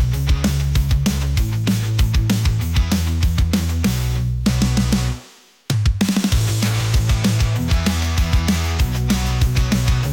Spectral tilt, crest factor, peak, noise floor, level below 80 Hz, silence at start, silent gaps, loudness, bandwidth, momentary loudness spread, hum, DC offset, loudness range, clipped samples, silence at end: -5.5 dB/octave; 10 dB; -6 dBFS; -46 dBFS; -22 dBFS; 0 s; none; -19 LUFS; 17 kHz; 3 LU; none; under 0.1%; 1 LU; under 0.1%; 0 s